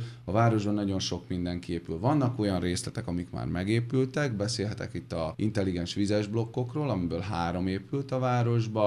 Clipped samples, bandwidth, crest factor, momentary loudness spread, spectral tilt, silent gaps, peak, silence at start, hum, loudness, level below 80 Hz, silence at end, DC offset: under 0.1%; 11.5 kHz; 18 dB; 7 LU; -6.5 dB/octave; none; -12 dBFS; 0 s; none; -30 LUFS; -54 dBFS; 0 s; under 0.1%